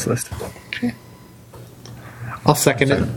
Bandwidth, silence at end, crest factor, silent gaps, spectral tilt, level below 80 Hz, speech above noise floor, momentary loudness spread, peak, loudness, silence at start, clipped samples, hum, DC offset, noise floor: 17.5 kHz; 0 s; 22 dB; none; -4.5 dB/octave; -46 dBFS; 23 dB; 24 LU; 0 dBFS; -20 LUFS; 0 s; under 0.1%; none; under 0.1%; -42 dBFS